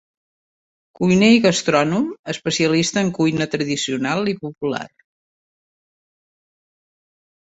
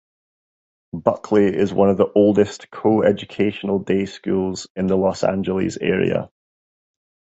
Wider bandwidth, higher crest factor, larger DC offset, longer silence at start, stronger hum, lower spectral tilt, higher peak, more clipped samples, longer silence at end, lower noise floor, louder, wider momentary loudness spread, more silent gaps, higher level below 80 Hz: about the same, 8.2 kHz vs 8.2 kHz; about the same, 20 dB vs 20 dB; neither; about the same, 1 s vs 0.95 s; neither; second, -4.5 dB/octave vs -7 dB/octave; about the same, -2 dBFS vs 0 dBFS; neither; first, 2.7 s vs 1.1 s; about the same, under -90 dBFS vs under -90 dBFS; about the same, -19 LUFS vs -19 LUFS; first, 12 LU vs 7 LU; about the same, 2.19-2.24 s vs 4.70-4.75 s; second, -58 dBFS vs -50 dBFS